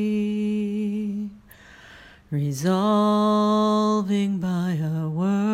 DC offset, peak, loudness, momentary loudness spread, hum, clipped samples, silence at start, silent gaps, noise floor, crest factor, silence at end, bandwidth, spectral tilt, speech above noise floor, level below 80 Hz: under 0.1%; -10 dBFS; -23 LUFS; 8 LU; none; under 0.1%; 0 s; none; -48 dBFS; 12 dB; 0 s; 14.5 kHz; -7 dB/octave; 27 dB; -58 dBFS